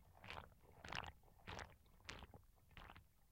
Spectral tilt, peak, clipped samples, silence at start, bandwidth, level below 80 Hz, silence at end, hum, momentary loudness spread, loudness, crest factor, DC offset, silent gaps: -3.5 dB/octave; -28 dBFS; under 0.1%; 0 s; 16.5 kHz; -68 dBFS; 0 s; none; 14 LU; -57 LUFS; 30 dB; under 0.1%; none